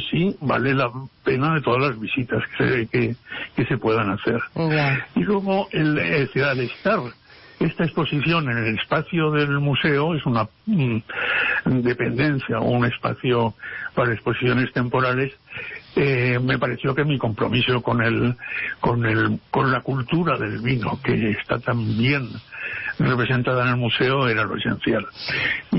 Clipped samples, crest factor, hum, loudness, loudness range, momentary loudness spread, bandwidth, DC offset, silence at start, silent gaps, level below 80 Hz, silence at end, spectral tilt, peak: under 0.1%; 12 dB; none; -22 LUFS; 1 LU; 6 LU; 5.8 kHz; under 0.1%; 0 s; none; -50 dBFS; 0 s; -11 dB/octave; -8 dBFS